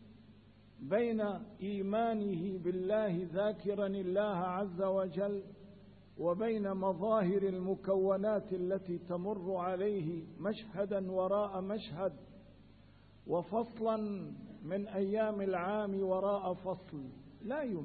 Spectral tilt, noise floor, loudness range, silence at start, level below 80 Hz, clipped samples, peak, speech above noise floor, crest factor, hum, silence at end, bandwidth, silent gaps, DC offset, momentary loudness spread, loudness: -6.5 dB/octave; -61 dBFS; 4 LU; 0 s; -68 dBFS; under 0.1%; -20 dBFS; 25 dB; 16 dB; none; 0 s; 4.6 kHz; none; under 0.1%; 9 LU; -36 LUFS